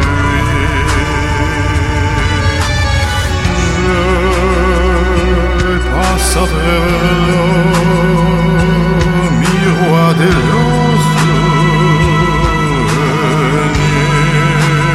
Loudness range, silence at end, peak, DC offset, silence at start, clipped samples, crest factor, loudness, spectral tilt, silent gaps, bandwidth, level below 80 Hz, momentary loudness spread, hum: 3 LU; 0 s; 0 dBFS; under 0.1%; 0 s; under 0.1%; 10 dB; -11 LUFS; -5.5 dB/octave; none; 13.5 kHz; -18 dBFS; 3 LU; none